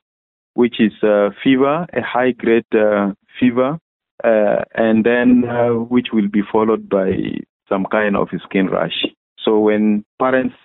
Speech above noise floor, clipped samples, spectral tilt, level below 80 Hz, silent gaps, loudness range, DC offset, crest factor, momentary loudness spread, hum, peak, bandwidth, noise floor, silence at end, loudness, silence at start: over 74 dB; under 0.1%; -11 dB/octave; -52 dBFS; 3.81-4.00 s, 4.11-4.18 s, 7.49-7.60 s, 9.17-9.36 s, 10.06-10.18 s; 3 LU; under 0.1%; 12 dB; 8 LU; none; -4 dBFS; 4.1 kHz; under -90 dBFS; 0.15 s; -16 LUFS; 0.55 s